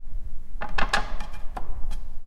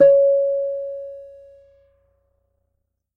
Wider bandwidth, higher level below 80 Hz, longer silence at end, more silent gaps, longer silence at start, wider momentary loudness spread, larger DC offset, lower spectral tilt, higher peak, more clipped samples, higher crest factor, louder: first, 10 kHz vs 3 kHz; first, -30 dBFS vs -64 dBFS; second, 0 s vs 1.9 s; neither; about the same, 0 s vs 0 s; second, 15 LU vs 22 LU; neither; second, -3.5 dB/octave vs -8 dB/octave; about the same, -6 dBFS vs -4 dBFS; neither; about the same, 16 dB vs 16 dB; second, -32 LUFS vs -19 LUFS